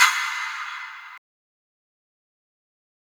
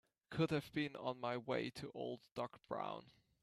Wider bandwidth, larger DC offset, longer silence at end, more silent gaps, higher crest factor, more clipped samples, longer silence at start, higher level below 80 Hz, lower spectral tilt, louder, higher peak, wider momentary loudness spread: first, over 20 kHz vs 13.5 kHz; neither; first, 1.85 s vs 0.3 s; second, none vs 2.32-2.36 s; first, 26 dB vs 20 dB; neither; second, 0 s vs 0.3 s; second, under -90 dBFS vs -76 dBFS; second, 6.5 dB/octave vs -6.5 dB/octave; first, -25 LUFS vs -44 LUFS; first, -2 dBFS vs -24 dBFS; first, 19 LU vs 9 LU